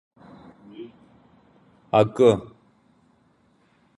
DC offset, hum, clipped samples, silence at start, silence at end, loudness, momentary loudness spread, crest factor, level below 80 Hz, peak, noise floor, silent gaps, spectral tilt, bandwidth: under 0.1%; none; under 0.1%; 0.8 s; 1.5 s; -20 LUFS; 26 LU; 22 dB; -60 dBFS; -4 dBFS; -62 dBFS; none; -7 dB/octave; 11 kHz